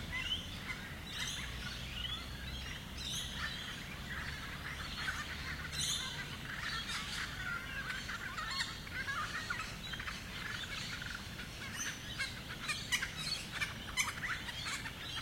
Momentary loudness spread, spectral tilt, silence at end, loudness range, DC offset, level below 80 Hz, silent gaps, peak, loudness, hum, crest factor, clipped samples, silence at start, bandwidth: 7 LU; -2 dB/octave; 0 s; 3 LU; under 0.1%; -54 dBFS; none; -18 dBFS; -40 LUFS; none; 22 dB; under 0.1%; 0 s; 16.5 kHz